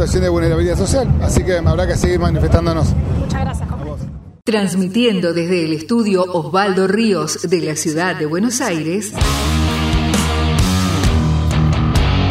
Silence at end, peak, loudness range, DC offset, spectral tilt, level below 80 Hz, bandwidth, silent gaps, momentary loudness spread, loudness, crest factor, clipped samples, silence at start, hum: 0 s; 0 dBFS; 2 LU; under 0.1%; -5.5 dB/octave; -24 dBFS; 15.5 kHz; none; 5 LU; -16 LUFS; 16 dB; under 0.1%; 0 s; none